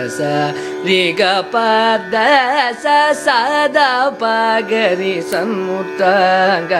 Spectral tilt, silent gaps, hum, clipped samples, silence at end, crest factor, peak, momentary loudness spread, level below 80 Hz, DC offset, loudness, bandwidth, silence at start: -4 dB/octave; none; none; under 0.1%; 0 s; 14 dB; 0 dBFS; 6 LU; -64 dBFS; under 0.1%; -14 LUFS; 16 kHz; 0 s